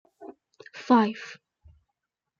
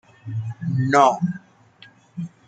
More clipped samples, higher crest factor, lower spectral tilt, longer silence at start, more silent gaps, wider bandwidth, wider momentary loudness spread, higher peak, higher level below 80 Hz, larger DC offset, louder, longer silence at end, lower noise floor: neither; about the same, 20 dB vs 22 dB; about the same, -6 dB/octave vs -6.5 dB/octave; about the same, 0.2 s vs 0.25 s; neither; second, 7.2 kHz vs 9.2 kHz; first, 26 LU vs 20 LU; second, -8 dBFS vs -2 dBFS; about the same, -68 dBFS vs -64 dBFS; neither; about the same, -23 LUFS vs -21 LUFS; first, 1.05 s vs 0.2 s; first, -84 dBFS vs -51 dBFS